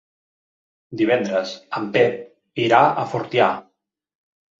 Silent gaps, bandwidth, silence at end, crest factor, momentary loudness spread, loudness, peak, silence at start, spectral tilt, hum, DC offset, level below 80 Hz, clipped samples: none; 7.6 kHz; 1 s; 20 dB; 16 LU; -20 LUFS; -2 dBFS; 0.9 s; -6 dB/octave; none; under 0.1%; -64 dBFS; under 0.1%